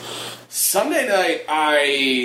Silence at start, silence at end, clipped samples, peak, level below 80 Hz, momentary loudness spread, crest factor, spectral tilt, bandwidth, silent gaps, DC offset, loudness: 0 s; 0 s; under 0.1%; -6 dBFS; -70 dBFS; 11 LU; 14 dB; -1 dB/octave; 16 kHz; none; under 0.1%; -18 LUFS